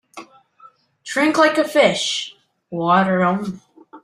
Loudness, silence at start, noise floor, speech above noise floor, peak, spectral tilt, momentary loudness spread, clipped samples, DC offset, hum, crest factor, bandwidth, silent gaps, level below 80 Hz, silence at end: -17 LUFS; 0.15 s; -50 dBFS; 33 dB; -2 dBFS; -4.5 dB/octave; 17 LU; under 0.1%; under 0.1%; none; 18 dB; 15.5 kHz; none; -64 dBFS; 0.05 s